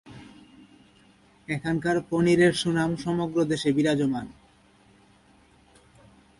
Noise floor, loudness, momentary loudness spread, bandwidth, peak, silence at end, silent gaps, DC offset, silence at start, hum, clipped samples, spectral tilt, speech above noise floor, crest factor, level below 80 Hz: -58 dBFS; -25 LUFS; 20 LU; 11.5 kHz; -10 dBFS; 2.05 s; none; under 0.1%; 0.05 s; none; under 0.1%; -6 dB/octave; 34 dB; 18 dB; -58 dBFS